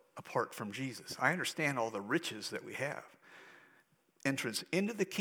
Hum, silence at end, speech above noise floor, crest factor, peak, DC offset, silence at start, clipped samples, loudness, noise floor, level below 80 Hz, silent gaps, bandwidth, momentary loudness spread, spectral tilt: none; 0 s; 33 dB; 24 dB; -14 dBFS; under 0.1%; 0.15 s; under 0.1%; -37 LUFS; -70 dBFS; -88 dBFS; none; over 20 kHz; 12 LU; -4 dB/octave